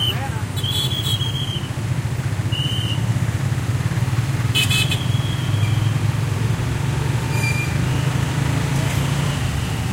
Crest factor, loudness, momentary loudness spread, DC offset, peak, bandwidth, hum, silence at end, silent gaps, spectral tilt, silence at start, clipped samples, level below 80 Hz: 14 dB; -21 LUFS; 4 LU; under 0.1%; -6 dBFS; 16 kHz; none; 0 s; none; -5 dB/octave; 0 s; under 0.1%; -36 dBFS